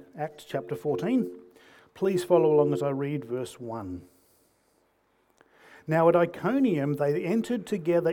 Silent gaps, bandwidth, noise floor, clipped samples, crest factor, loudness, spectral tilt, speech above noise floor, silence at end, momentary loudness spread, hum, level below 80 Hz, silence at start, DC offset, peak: none; 18.5 kHz; -69 dBFS; under 0.1%; 18 dB; -27 LUFS; -7.5 dB/octave; 43 dB; 0 s; 15 LU; none; -70 dBFS; 0.15 s; under 0.1%; -10 dBFS